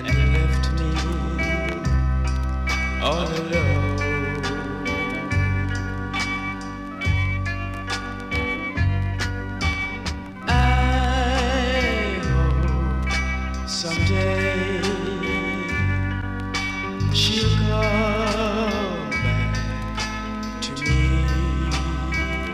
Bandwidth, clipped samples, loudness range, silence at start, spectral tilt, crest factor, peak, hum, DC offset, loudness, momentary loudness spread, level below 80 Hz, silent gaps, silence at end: 11.5 kHz; under 0.1%; 4 LU; 0 s; -5.5 dB/octave; 14 dB; -8 dBFS; none; under 0.1%; -23 LUFS; 7 LU; -26 dBFS; none; 0 s